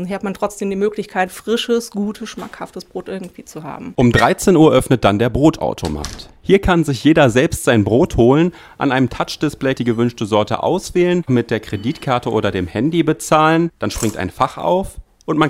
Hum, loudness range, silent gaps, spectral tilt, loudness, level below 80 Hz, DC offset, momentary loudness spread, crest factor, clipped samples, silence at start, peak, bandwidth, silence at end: none; 6 LU; none; -6 dB/octave; -16 LUFS; -36 dBFS; under 0.1%; 16 LU; 16 dB; under 0.1%; 0 s; 0 dBFS; 16 kHz; 0 s